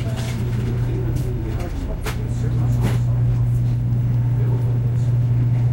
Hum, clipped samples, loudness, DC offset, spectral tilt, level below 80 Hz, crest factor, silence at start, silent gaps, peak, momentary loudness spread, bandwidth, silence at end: none; under 0.1%; -21 LUFS; under 0.1%; -8 dB/octave; -30 dBFS; 10 dB; 0 s; none; -8 dBFS; 7 LU; 16 kHz; 0 s